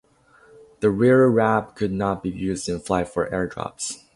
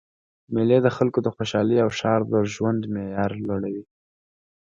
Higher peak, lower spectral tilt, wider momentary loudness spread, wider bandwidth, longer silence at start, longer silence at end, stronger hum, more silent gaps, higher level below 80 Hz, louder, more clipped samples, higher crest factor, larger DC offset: about the same, -4 dBFS vs -4 dBFS; about the same, -6 dB/octave vs -7 dB/octave; first, 13 LU vs 9 LU; first, 11.5 kHz vs 7.6 kHz; first, 0.8 s vs 0.5 s; second, 0.2 s vs 0.9 s; neither; neither; first, -48 dBFS vs -56 dBFS; about the same, -22 LUFS vs -23 LUFS; neither; about the same, 18 dB vs 18 dB; neither